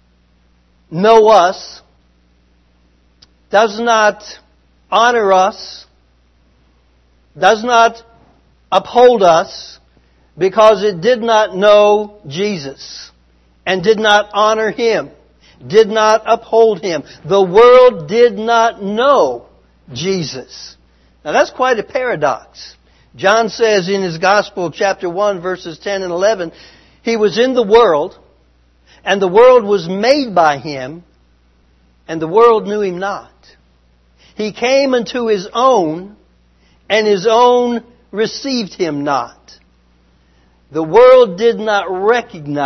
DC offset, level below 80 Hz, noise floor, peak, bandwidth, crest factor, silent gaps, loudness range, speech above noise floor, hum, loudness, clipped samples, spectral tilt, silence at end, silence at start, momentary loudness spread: under 0.1%; -52 dBFS; -53 dBFS; 0 dBFS; 6.4 kHz; 14 dB; none; 6 LU; 41 dB; 60 Hz at -50 dBFS; -12 LUFS; 0.1%; -4.5 dB/octave; 0 s; 0.9 s; 17 LU